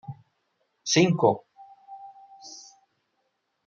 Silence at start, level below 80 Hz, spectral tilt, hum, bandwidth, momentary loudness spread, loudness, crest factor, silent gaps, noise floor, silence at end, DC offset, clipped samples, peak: 0.1 s; -72 dBFS; -4.5 dB/octave; none; 7.6 kHz; 26 LU; -23 LUFS; 24 dB; none; -76 dBFS; 1.05 s; under 0.1%; under 0.1%; -6 dBFS